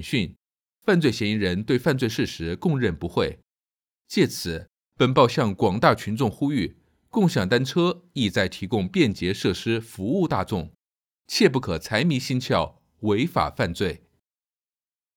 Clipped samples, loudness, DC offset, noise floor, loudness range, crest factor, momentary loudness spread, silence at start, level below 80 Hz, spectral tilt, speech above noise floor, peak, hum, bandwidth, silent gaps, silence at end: under 0.1%; -24 LUFS; under 0.1%; under -90 dBFS; 3 LU; 20 dB; 9 LU; 0 s; -50 dBFS; -6 dB/octave; over 67 dB; -4 dBFS; none; 18.5 kHz; 0.62-0.66 s; 1.2 s